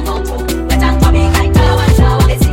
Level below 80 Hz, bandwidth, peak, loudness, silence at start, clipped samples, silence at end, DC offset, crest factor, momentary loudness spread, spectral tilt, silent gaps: -14 dBFS; 17 kHz; 0 dBFS; -11 LUFS; 0 s; under 0.1%; 0 s; under 0.1%; 10 dB; 8 LU; -6 dB/octave; none